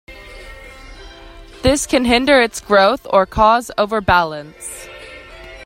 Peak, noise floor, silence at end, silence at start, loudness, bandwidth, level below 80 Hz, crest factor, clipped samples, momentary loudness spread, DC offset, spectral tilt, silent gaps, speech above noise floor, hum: 0 dBFS; -38 dBFS; 0 s; 0.1 s; -15 LUFS; 16 kHz; -36 dBFS; 18 dB; under 0.1%; 23 LU; under 0.1%; -3.5 dB/octave; none; 23 dB; none